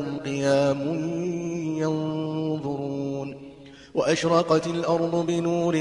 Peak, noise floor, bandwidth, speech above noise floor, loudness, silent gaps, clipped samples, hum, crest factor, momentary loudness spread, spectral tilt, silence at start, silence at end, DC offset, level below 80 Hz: -8 dBFS; -45 dBFS; 11 kHz; 22 dB; -25 LUFS; none; under 0.1%; none; 18 dB; 9 LU; -6 dB/octave; 0 s; 0 s; under 0.1%; -60 dBFS